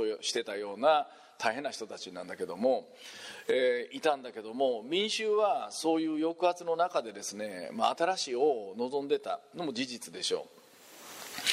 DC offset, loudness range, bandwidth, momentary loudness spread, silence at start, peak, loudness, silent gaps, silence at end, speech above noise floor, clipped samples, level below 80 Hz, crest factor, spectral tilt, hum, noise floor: under 0.1%; 3 LU; 16 kHz; 13 LU; 0 s; -12 dBFS; -32 LUFS; none; 0 s; 21 dB; under 0.1%; -84 dBFS; 20 dB; -2.5 dB/octave; none; -53 dBFS